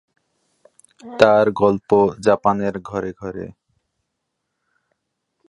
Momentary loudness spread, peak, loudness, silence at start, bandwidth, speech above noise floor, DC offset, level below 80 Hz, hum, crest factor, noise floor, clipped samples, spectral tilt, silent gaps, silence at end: 18 LU; 0 dBFS; -17 LUFS; 1.05 s; 11 kHz; 59 dB; under 0.1%; -54 dBFS; none; 20 dB; -77 dBFS; under 0.1%; -6.5 dB/octave; none; 2 s